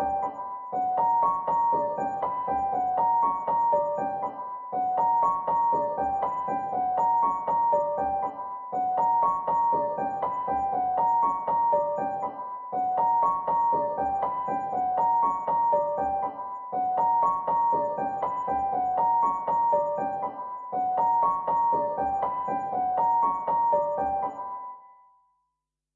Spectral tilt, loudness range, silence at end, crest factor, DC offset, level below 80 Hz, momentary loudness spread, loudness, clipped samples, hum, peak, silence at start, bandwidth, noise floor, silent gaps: -6 dB/octave; 2 LU; 1.1 s; 14 dB; under 0.1%; -62 dBFS; 9 LU; -26 LUFS; under 0.1%; none; -12 dBFS; 0 s; 7 kHz; -83 dBFS; none